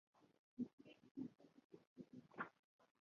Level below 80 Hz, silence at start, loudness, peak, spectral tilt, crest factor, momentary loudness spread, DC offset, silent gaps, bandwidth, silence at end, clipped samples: under -90 dBFS; 0.15 s; -56 LUFS; -34 dBFS; -5.5 dB/octave; 24 dB; 14 LU; under 0.1%; 0.39-0.57 s, 0.73-0.78 s, 1.11-1.15 s, 1.64-1.70 s, 1.87-1.96 s, 2.59-2.79 s; 7 kHz; 0.2 s; under 0.1%